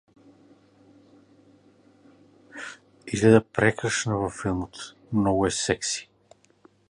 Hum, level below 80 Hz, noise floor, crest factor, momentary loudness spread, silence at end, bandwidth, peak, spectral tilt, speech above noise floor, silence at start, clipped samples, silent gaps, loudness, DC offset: none; -52 dBFS; -59 dBFS; 24 dB; 21 LU; 0.9 s; 11 kHz; -4 dBFS; -4.5 dB/octave; 36 dB; 2.55 s; under 0.1%; none; -24 LUFS; under 0.1%